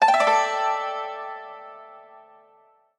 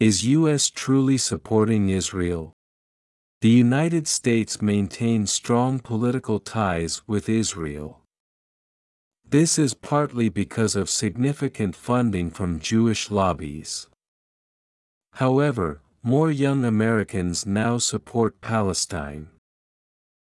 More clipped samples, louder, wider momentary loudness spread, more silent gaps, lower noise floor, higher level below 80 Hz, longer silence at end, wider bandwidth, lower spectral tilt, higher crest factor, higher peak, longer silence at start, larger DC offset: neither; about the same, -23 LUFS vs -23 LUFS; first, 24 LU vs 9 LU; second, none vs 2.53-3.41 s, 8.20-9.11 s, 14.08-15.01 s; second, -59 dBFS vs under -90 dBFS; second, -78 dBFS vs -54 dBFS; second, 0.8 s vs 0.95 s; about the same, 11.5 kHz vs 12 kHz; second, -0.5 dB/octave vs -5 dB/octave; about the same, 18 dB vs 16 dB; about the same, -6 dBFS vs -6 dBFS; about the same, 0 s vs 0 s; neither